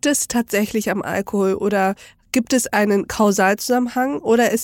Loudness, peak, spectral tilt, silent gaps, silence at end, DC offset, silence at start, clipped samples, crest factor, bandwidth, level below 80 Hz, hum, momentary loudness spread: -19 LUFS; -2 dBFS; -4 dB/octave; none; 0 s; under 0.1%; 0.05 s; under 0.1%; 16 dB; 17 kHz; -52 dBFS; none; 6 LU